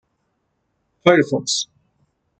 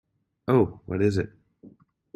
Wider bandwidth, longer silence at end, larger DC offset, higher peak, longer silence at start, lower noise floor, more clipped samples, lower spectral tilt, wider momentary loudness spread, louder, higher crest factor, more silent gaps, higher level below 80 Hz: second, 9.2 kHz vs 12 kHz; first, 0.75 s vs 0.45 s; neither; first, -2 dBFS vs -8 dBFS; first, 1.05 s vs 0.5 s; first, -71 dBFS vs -54 dBFS; neither; second, -4 dB/octave vs -8.5 dB/octave; second, 8 LU vs 14 LU; first, -18 LUFS vs -25 LUFS; about the same, 20 dB vs 20 dB; neither; second, -64 dBFS vs -56 dBFS